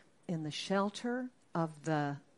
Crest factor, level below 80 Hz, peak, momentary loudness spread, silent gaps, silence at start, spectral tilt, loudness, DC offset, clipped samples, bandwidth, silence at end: 18 dB; -80 dBFS; -20 dBFS; 7 LU; none; 0.3 s; -5.5 dB/octave; -37 LUFS; under 0.1%; under 0.1%; 11.5 kHz; 0.2 s